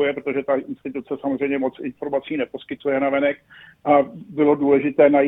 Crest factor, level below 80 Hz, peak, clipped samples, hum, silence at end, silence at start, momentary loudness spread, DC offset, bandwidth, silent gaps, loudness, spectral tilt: 18 dB; -62 dBFS; -2 dBFS; under 0.1%; none; 0 s; 0 s; 12 LU; under 0.1%; 4 kHz; none; -21 LUFS; -9 dB/octave